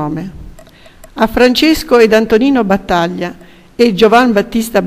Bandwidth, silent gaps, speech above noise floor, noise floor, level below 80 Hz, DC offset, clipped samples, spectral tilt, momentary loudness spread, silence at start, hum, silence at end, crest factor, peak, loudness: 16.5 kHz; none; 28 dB; -38 dBFS; -34 dBFS; under 0.1%; 0.5%; -5 dB/octave; 15 LU; 0 s; none; 0 s; 12 dB; 0 dBFS; -11 LUFS